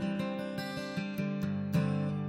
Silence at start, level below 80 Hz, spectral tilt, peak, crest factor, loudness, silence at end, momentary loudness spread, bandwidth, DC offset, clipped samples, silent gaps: 0 s; -62 dBFS; -7.5 dB/octave; -18 dBFS; 16 dB; -34 LUFS; 0 s; 6 LU; 16 kHz; under 0.1%; under 0.1%; none